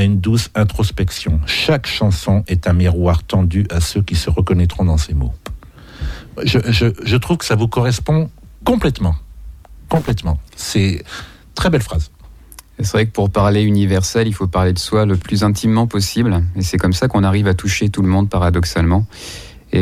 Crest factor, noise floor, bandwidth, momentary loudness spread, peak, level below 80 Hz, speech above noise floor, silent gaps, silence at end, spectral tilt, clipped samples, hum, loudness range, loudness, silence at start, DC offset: 14 dB; -40 dBFS; 15.5 kHz; 10 LU; -2 dBFS; -28 dBFS; 25 dB; none; 0 s; -6 dB/octave; under 0.1%; none; 4 LU; -16 LUFS; 0 s; under 0.1%